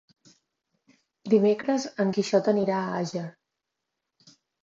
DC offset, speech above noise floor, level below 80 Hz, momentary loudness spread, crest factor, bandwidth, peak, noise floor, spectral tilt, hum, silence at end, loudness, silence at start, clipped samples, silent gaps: under 0.1%; 59 dB; -76 dBFS; 13 LU; 20 dB; 7.8 kHz; -8 dBFS; -84 dBFS; -6 dB/octave; none; 1.35 s; -25 LUFS; 1.25 s; under 0.1%; none